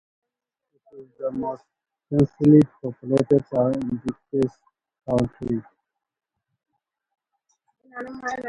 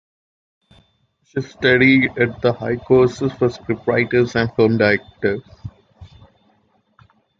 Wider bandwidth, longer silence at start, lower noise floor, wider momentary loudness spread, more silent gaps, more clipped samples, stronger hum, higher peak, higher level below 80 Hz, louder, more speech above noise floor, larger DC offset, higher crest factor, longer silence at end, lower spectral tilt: first, 11 kHz vs 7.6 kHz; second, 0.95 s vs 1.35 s; first, -75 dBFS vs -62 dBFS; first, 18 LU vs 15 LU; neither; neither; neither; about the same, -4 dBFS vs -2 dBFS; second, -54 dBFS vs -48 dBFS; second, -23 LUFS vs -17 LUFS; first, 53 dB vs 45 dB; neither; about the same, 20 dB vs 18 dB; second, 0 s vs 1.35 s; first, -9 dB/octave vs -7 dB/octave